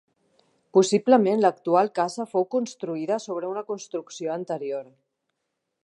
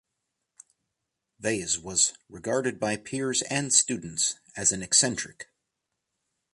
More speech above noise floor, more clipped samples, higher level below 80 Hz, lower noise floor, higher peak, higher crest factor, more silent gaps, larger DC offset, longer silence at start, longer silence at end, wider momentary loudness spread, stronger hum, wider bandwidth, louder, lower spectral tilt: about the same, 56 dB vs 56 dB; neither; second, -82 dBFS vs -62 dBFS; about the same, -80 dBFS vs -83 dBFS; first, -4 dBFS vs -8 dBFS; about the same, 20 dB vs 22 dB; neither; neither; second, 0.75 s vs 1.4 s; about the same, 1.05 s vs 1.1 s; first, 13 LU vs 9 LU; neither; about the same, 11.5 kHz vs 11.5 kHz; about the same, -24 LUFS vs -25 LUFS; first, -5 dB/octave vs -2 dB/octave